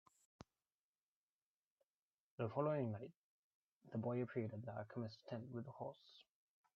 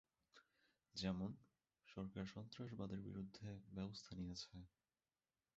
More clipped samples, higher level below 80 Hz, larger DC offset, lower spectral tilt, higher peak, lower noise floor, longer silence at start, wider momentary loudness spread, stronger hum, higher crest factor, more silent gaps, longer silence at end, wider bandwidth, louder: neither; second, -86 dBFS vs -70 dBFS; neither; first, -7.5 dB/octave vs -6 dB/octave; first, -26 dBFS vs -32 dBFS; about the same, under -90 dBFS vs under -90 dBFS; first, 2.4 s vs 0.35 s; first, 24 LU vs 11 LU; neither; about the same, 22 dB vs 22 dB; first, 3.16-3.81 s vs none; second, 0.55 s vs 0.9 s; about the same, 7 kHz vs 7.6 kHz; first, -47 LUFS vs -52 LUFS